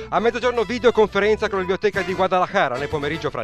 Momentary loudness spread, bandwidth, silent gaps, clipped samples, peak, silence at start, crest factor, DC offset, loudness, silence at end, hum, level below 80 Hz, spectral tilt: 6 LU; 11.5 kHz; none; under 0.1%; -4 dBFS; 0 s; 16 dB; 0.2%; -20 LUFS; 0 s; none; -44 dBFS; -5.5 dB/octave